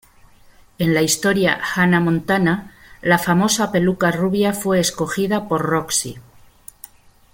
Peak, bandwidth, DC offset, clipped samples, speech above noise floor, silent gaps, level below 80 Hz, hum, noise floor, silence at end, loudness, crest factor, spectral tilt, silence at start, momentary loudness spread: -2 dBFS; 17 kHz; under 0.1%; under 0.1%; 31 dB; none; -50 dBFS; none; -49 dBFS; 1.1 s; -18 LUFS; 18 dB; -4.5 dB/octave; 0.8 s; 6 LU